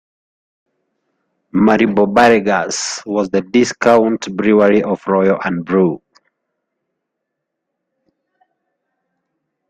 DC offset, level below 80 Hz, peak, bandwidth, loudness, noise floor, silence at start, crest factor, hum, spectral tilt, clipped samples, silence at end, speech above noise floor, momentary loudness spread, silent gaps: under 0.1%; -54 dBFS; 0 dBFS; 10 kHz; -14 LUFS; -77 dBFS; 1.55 s; 16 dB; none; -5 dB/octave; under 0.1%; 3.7 s; 63 dB; 8 LU; none